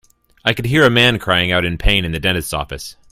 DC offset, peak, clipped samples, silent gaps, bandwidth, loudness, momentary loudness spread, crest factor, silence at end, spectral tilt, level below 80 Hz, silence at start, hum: under 0.1%; 0 dBFS; under 0.1%; none; 16 kHz; -15 LUFS; 12 LU; 16 dB; 0.2 s; -4.5 dB/octave; -28 dBFS; 0.45 s; none